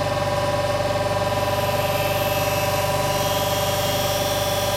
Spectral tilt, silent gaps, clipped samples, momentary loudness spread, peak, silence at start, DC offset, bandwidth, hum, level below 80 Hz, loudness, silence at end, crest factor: -4 dB/octave; none; under 0.1%; 1 LU; -10 dBFS; 0 s; under 0.1%; 16 kHz; 50 Hz at -35 dBFS; -40 dBFS; -21 LUFS; 0 s; 12 dB